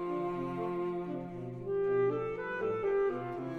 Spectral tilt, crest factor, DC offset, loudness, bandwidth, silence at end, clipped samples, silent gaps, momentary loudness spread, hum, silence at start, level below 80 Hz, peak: -9 dB/octave; 12 dB; under 0.1%; -34 LUFS; 4.7 kHz; 0 s; under 0.1%; none; 9 LU; none; 0 s; -62 dBFS; -22 dBFS